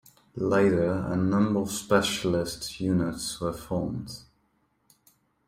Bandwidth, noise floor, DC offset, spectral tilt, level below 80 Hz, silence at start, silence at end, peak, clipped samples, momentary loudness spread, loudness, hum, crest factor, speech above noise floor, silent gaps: 16 kHz; -70 dBFS; under 0.1%; -5.5 dB/octave; -54 dBFS; 0.35 s; 1.25 s; -8 dBFS; under 0.1%; 10 LU; -27 LUFS; none; 20 dB; 44 dB; none